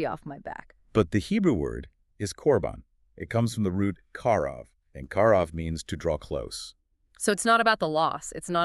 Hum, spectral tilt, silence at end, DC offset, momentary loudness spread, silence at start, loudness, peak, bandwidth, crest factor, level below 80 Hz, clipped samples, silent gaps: none; -5 dB/octave; 0 s; under 0.1%; 18 LU; 0 s; -27 LUFS; -8 dBFS; 13.5 kHz; 18 dB; -48 dBFS; under 0.1%; none